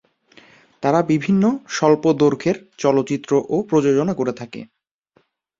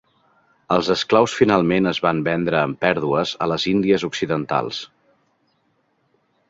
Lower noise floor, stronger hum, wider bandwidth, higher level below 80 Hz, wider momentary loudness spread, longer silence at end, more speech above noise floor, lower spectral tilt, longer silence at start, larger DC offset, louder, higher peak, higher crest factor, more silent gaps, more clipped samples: second, -62 dBFS vs -66 dBFS; neither; about the same, 7.8 kHz vs 8 kHz; about the same, -58 dBFS vs -54 dBFS; about the same, 8 LU vs 7 LU; second, 0.95 s vs 1.65 s; about the same, 44 dB vs 47 dB; about the same, -6.5 dB/octave vs -5.5 dB/octave; about the same, 0.8 s vs 0.7 s; neither; about the same, -19 LUFS vs -19 LUFS; about the same, -2 dBFS vs -2 dBFS; about the same, 18 dB vs 20 dB; neither; neither